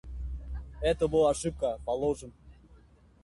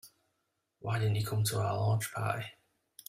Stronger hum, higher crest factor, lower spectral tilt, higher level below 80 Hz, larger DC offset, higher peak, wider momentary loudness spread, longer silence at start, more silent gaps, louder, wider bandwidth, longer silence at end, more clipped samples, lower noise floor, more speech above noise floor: neither; about the same, 18 dB vs 16 dB; about the same, -5.5 dB/octave vs -5 dB/octave; first, -42 dBFS vs -66 dBFS; neither; first, -14 dBFS vs -18 dBFS; first, 15 LU vs 8 LU; about the same, 0.05 s vs 0.05 s; neither; first, -30 LUFS vs -33 LUFS; second, 11.5 kHz vs 16 kHz; about the same, 0.45 s vs 0.55 s; neither; second, -58 dBFS vs -81 dBFS; second, 30 dB vs 50 dB